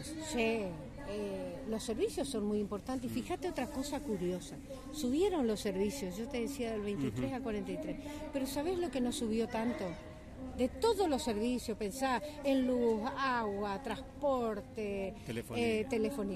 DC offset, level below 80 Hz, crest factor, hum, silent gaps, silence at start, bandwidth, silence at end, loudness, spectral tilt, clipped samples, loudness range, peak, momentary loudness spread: under 0.1%; -54 dBFS; 16 dB; none; none; 0 s; 14.5 kHz; 0 s; -36 LUFS; -5 dB/octave; under 0.1%; 4 LU; -20 dBFS; 9 LU